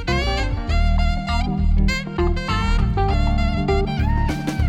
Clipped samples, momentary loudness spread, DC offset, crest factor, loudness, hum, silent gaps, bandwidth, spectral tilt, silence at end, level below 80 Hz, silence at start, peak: under 0.1%; 3 LU; under 0.1%; 12 dB; -21 LUFS; none; none; 9.6 kHz; -6.5 dB/octave; 0 s; -20 dBFS; 0 s; -6 dBFS